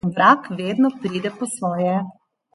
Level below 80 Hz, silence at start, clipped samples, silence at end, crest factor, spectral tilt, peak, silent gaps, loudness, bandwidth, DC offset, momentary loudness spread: -62 dBFS; 0.05 s; under 0.1%; 0.45 s; 18 dB; -5.5 dB/octave; -2 dBFS; none; -20 LUFS; 11.5 kHz; under 0.1%; 10 LU